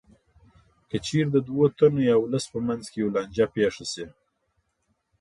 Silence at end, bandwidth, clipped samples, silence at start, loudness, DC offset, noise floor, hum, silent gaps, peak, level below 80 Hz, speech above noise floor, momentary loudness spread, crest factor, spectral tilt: 1.1 s; 11.5 kHz; under 0.1%; 0.95 s; -25 LUFS; under 0.1%; -74 dBFS; none; none; -6 dBFS; -58 dBFS; 50 dB; 13 LU; 20 dB; -6 dB/octave